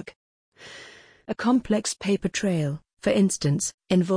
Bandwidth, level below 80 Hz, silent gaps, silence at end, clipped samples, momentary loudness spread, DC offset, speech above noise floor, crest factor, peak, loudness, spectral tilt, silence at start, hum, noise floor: 10.5 kHz; -56 dBFS; 0.16-0.52 s, 3.74-3.78 s; 0 s; under 0.1%; 21 LU; under 0.1%; 25 dB; 16 dB; -10 dBFS; -25 LUFS; -5 dB/octave; 0 s; none; -48 dBFS